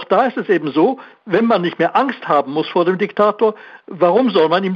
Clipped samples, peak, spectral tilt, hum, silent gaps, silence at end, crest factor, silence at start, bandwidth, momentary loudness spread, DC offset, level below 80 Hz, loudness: under 0.1%; -2 dBFS; -8 dB/octave; none; none; 0 s; 14 dB; 0 s; 6.8 kHz; 5 LU; under 0.1%; -64 dBFS; -16 LUFS